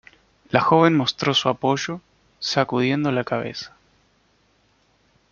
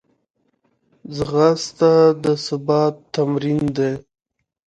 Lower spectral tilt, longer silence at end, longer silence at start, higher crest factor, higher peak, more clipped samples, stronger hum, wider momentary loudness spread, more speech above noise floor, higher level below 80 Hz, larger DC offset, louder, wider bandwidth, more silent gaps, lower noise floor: second, -5 dB/octave vs -6.5 dB/octave; first, 1.65 s vs 0.7 s; second, 0.5 s vs 1.05 s; about the same, 22 dB vs 18 dB; about the same, -2 dBFS vs 0 dBFS; neither; neither; first, 15 LU vs 10 LU; second, 42 dB vs 51 dB; second, -60 dBFS vs -52 dBFS; neither; second, -21 LUFS vs -18 LUFS; second, 7.4 kHz vs 9.2 kHz; neither; second, -62 dBFS vs -68 dBFS